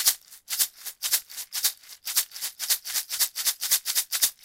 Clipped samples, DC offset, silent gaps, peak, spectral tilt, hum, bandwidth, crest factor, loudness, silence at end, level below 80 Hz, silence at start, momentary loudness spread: under 0.1%; under 0.1%; none; -4 dBFS; 4.5 dB/octave; none; 17 kHz; 24 dB; -25 LUFS; 0.1 s; -70 dBFS; 0 s; 9 LU